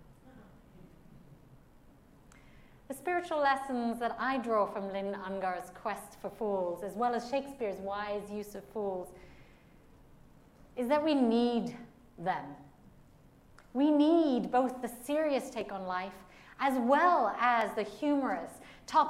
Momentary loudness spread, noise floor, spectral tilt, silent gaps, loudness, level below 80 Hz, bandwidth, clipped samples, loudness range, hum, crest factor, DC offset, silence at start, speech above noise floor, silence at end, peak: 15 LU; -59 dBFS; -5.5 dB/octave; none; -32 LUFS; -64 dBFS; 15.5 kHz; under 0.1%; 7 LU; none; 20 dB; under 0.1%; 0.1 s; 28 dB; 0 s; -14 dBFS